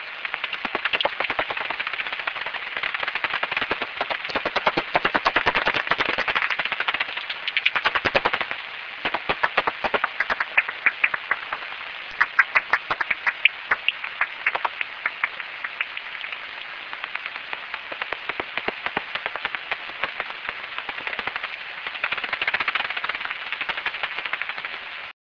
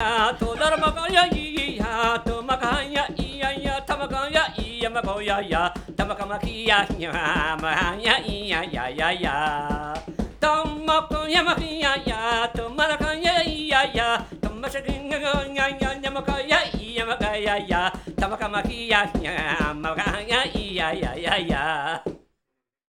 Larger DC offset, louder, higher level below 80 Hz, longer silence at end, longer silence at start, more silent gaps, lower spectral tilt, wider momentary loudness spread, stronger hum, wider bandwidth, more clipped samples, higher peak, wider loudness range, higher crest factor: neither; about the same, -24 LUFS vs -23 LUFS; second, -58 dBFS vs -38 dBFS; second, 0.15 s vs 0.7 s; about the same, 0 s vs 0 s; neither; about the same, -3.5 dB/octave vs -4 dB/octave; about the same, 10 LU vs 8 LU; neither; second, 5.4 kHz vs 18 kHz; neither; about the same, -2 dBFS vs 0 dBFS; first, 7 LU vs 3 LU; about the same, 24 dB vs 24 dB